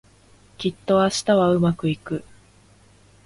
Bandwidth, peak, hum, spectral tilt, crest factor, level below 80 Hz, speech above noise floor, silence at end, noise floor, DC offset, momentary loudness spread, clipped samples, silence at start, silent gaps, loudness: 11.5 kHz; -6 dBFS; 50 Hz at -45 dBFS; -5.5 dB/octave; 16 dB; -54 dBFS; 33 dB; 1.05 s; -53 dBFS; under 0.1%; 11 LU; under 0.1%; 0.6 s; none; -21 LUFS